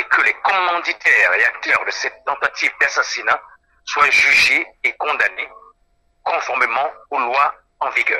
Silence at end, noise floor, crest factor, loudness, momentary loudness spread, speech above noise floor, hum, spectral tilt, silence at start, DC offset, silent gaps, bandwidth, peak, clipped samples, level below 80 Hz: 0 s; -61 dBFS; 18 dB; -16 LUFS; 11 LU; 43 dB; none; 0 dB/octave; 0 s; under 0.1%; none; 16.5 kHz; -2 dBFS; under 0.1%; -58 dBFS